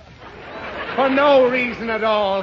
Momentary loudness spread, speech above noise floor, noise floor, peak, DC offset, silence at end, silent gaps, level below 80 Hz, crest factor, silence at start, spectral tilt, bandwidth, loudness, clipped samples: 19 LU; 22 dB; -39 dBFS; -4 dBFS; under 0.1%; 0 s; none; -50 dBFS; 16 dB; 0.1 s; -6 dB/octave; 7 kHz; -17 LUFS; under 0.1%